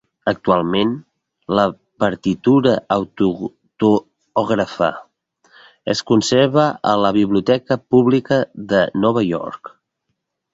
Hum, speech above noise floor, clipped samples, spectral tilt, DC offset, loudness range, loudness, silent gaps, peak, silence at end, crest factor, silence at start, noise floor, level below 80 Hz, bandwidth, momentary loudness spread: none; 58 dB; under 0.1%; -6 dB/octave; under 0.1%; 4 LU; -17 LUFS; none; -2 dBFS; 0.85 s; 16 dB; 0.25 s; -74 dBFS; -52 dBFS; 8 kHz; 9 LU